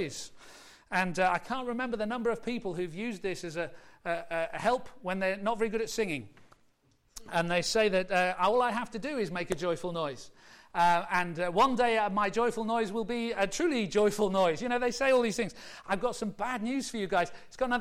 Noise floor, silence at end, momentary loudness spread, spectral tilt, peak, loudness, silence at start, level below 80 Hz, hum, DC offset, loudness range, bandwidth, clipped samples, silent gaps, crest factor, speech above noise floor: -68 dBFS; 0 s; 10 LU; -4.5 dB/octave; -16 dBFS; -30 LUFS; 0 s; -58 dBFS; none; under 0.1%; 5 LU; 16 kHz; under 0.1%; none; 16 dB; 38 dB